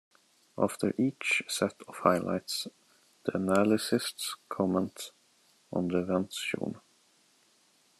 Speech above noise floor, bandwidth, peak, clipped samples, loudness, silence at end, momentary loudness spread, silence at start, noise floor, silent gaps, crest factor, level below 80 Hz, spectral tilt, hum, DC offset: 36 dB; 13 kHz; -10 dBFS; under 0.1%; -31 LUFS; 1.2 s; 11 LU; 0.55 s; -67 dBFS; none; 22 dB; -76 dBFS; -4.5 dB/octave; none; under 0.1%